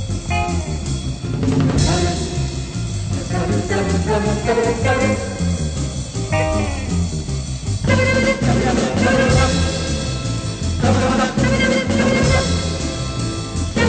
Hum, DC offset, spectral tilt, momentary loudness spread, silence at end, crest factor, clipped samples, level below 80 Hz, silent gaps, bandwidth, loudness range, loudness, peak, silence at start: none; under 0.1%; -5.5 dB/octave; 8 LU; 0 s; 14 dB; under 0.1%; -28 dBFS; none; 9.2 kHz; 3 LU; -19 LUFS; -4 dBFS; 0 s